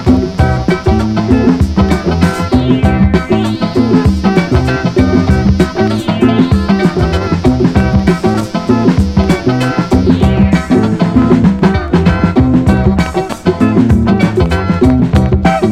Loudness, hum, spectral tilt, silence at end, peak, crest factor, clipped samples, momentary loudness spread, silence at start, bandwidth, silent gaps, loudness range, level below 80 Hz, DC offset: -11 LUFS; none; -7.5 dB/octave; 0 s; 0 dBFS; 10 dB; 0.4%; 3 LU; 0 s; 13 kHz; none; 1 LU; -20 dBFS; 0.8%